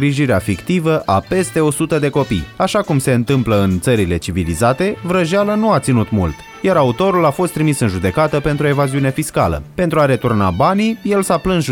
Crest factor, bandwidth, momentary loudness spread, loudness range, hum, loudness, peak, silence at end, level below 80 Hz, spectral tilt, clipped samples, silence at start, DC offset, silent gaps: 12 dB; 17.5 kHz; 4 LU; 1 LU; none; -16 LUFS; -2 dBFS; 0 s; -38 dBFS; -6 dB/octave; under 0.1%; 0 s; under 0.1%; none